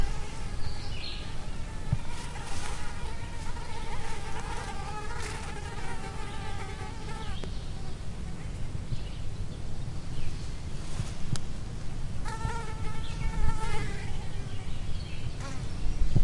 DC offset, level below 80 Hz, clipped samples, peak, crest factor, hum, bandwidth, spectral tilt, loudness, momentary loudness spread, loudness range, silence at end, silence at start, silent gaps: 0.3%; -34 dBFS; under 0.1%; -10 dBFS; 18 dB; none; 11.5 kHz; -5 dB/octave; -38 LUFS; 5 LU; 3 LU; 0 s; 0 s; none